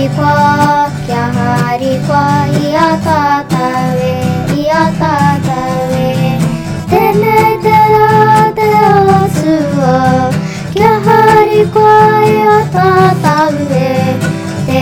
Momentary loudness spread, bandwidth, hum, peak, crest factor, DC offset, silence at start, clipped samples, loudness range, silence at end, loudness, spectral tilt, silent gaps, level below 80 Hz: 8 LU; 18.5 kHz; none; 0 dBFS; 10 dB; under 0.1%; 0 s; 1%; 4 LU; 0 s; -10 LUFS; -6.5 dB/octave; none; -38 dBFS